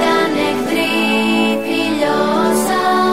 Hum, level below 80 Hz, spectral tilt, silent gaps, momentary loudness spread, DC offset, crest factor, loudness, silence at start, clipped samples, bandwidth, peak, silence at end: none; -50 dBFS; -4 dB/octave; none; 3 LU; 1%; 10 dB; -15 LUFS; 0 s; under 0.1%; 16 kHz; -4 dBFS; 0 s